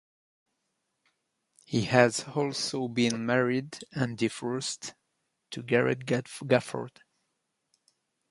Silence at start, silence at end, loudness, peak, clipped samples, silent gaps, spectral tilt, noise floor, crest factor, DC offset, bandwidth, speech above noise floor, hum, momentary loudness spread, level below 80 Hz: 1.7 s; 1.4 s; -29 LUFS; -4 dBFS; under 0.1%; none; -5 dB/octave; -80 dBFS; 26 dB; under 0.1%; 11.5 kHz; 52 dB; none; 14 LU; -68 dBFS